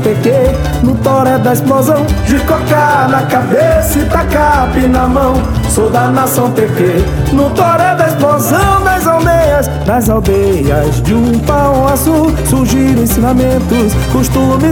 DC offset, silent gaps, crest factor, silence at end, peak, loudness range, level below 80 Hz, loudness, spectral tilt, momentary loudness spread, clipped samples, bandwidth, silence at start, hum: under 0.1%; none; 10 dB; 0 s; 0 dBFS; 1 LU; -20 dBFS; -10 LUFS; -6 dB/octave; 2 LU; under 0.1%; 18 kHz; 0 s; none